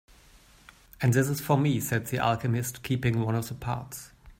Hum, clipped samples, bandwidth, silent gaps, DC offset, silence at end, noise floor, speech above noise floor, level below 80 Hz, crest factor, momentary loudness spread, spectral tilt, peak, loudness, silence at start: none; under 0.1%; 16.5 kHz; none; under 0.1%; 0.05 s; -56 dBFS; 29 dB; -54 dBFS; 18 dB; 9 LU; -6 dB/octave; -10 dBFS; -28 LUFS; 1 s